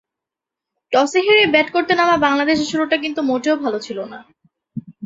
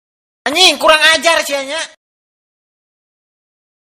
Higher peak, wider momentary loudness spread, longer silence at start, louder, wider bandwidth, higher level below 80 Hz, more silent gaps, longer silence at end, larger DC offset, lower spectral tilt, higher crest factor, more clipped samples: about the same, -2 dBFS vs 0 dBFS; about the same, 17 LU vs 15 LU; first, 0.9 s vs 0.45 s; second, -16 LUFS vs -10 LUFS; second, 8 kHz vs over 20 kHz; second, -58 dBFS vs -52 dBFS; neither; second, 0 s vs 1.95 s; neither; first, -3.5 dB/octave vs 0.5 dB/octave; about the same, 16 dB vs 16 dB; second, under 0.1% vs 0.4%